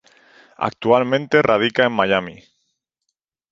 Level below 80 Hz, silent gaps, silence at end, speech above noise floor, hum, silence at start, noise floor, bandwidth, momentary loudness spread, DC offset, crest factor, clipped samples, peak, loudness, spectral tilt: -58 dBFS; none; 1.2 s; 60 dB; none; 0.6 s; -78 dBFS; 7.6 kHz; 10 LU; under 0.1%; 18 dB; under 0.1%; -2 dBFS; -18 LUFS; -6 dB/octave